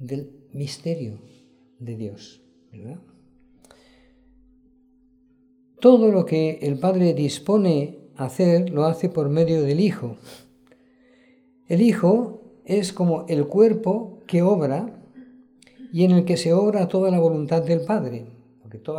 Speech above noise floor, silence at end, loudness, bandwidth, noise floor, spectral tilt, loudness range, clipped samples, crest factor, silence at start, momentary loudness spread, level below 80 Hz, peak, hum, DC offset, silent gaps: 38 dB; 0 s; -21 LUFS; 12 kHz; -58 dBFS; -7.5 dB/octave; 15 LU; under 0.1%; 20 dB; 0 s; 18 LU; -66 dBFS; -2 dBFS; none; under 0.1%; none